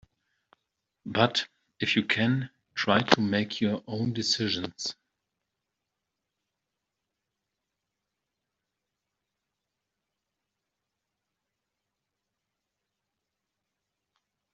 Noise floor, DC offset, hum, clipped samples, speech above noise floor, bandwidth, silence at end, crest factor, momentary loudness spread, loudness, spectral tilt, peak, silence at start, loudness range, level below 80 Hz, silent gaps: -85 dBFS; under 0.1%; none; under 0.1%; 58 dB; 8 kHz; 9.6 s; 32 dB; 11 LU; -27 LUFS; -3 dB/octave; 0 dBFS; 1.05 s; 9 LU; -70 dBFS; none